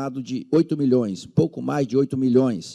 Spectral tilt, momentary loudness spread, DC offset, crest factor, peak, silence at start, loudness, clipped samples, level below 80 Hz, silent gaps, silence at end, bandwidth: -8 dB/octave; 6 LU; under 0.1%; 14 dB; -6 dBFS; 0 s; -22 LUFS; under 0.1%; -60 dBFS; none; 0 s; 10.5 kHz